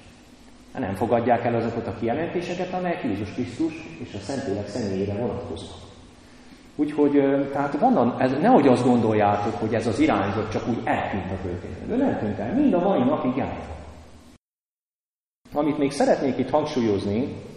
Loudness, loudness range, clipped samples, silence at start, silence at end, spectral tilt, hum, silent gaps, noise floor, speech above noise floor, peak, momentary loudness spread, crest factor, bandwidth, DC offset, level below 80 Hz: -23 LUFS; 8 LU; under 0.1%; 0.05 s; 0 s; -7 dB/octave; none; 14.61-14.77 s, 14.83-14.88 s, 15.00-15.04 s, 15.14-15.19 s, 15.35-15.39 s; under -90 dBFS; over 67 dB; -4 dBFS; 12 LU; 20 dB; 11.5 kHz; under 0.1%; -52 dBFS